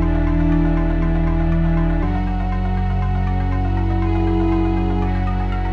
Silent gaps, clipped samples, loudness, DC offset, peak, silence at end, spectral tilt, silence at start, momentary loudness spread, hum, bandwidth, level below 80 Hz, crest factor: none; under 0.1%; -20 LUFS; under 0.1%; -6 dBFS; 0 s; -9.5 dB/octave; 0 s; 4 LU; none; 4.7 kHz; -20 dBFS; 10 dB